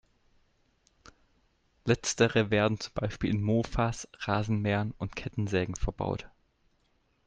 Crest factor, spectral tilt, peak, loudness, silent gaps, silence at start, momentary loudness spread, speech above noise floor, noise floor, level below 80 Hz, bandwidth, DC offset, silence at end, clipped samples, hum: 22 dB; -5.5 dB/octave; -10 dBFS; -30 LUFS; none; 1.85 s; 10 LU; 42 dB; -71 dBFS; -46 dBFS; 9.4 kHz; under 0.1%; 1 s; under 0.1%; none